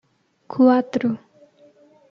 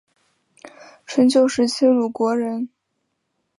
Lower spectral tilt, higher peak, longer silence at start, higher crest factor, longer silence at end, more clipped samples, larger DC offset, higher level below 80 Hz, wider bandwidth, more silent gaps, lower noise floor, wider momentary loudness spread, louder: first, -7.5 dB/octave vs -4 dB/octave; about the same, -4 dBFS vs -4 dBFS; second, 0.5 s vs 0.65 s; about the same, 18 dB vs 16 dB; about the same, 0.95 s vs 0.95 s; neither; neither; about the same, -70 dBFS vs -66 dBFS; second, 6.8 kHz vs 11.5 kHz; neither; second, -53 dBFS vs -74 dBFS; first, 16 LU vs 11 LU; about the same, -19 LUFS vs -19 LUFS